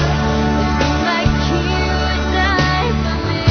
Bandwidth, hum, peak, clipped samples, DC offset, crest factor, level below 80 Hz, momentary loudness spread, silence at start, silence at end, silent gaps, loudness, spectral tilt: 6.6 kHz; none; 0 dBFS; under 0.1%; under 0.1%; 16 dB; -22 dBFS; 3 LU; 0 s; 0 s; none; -16 LUFS; -5.5 dB/octave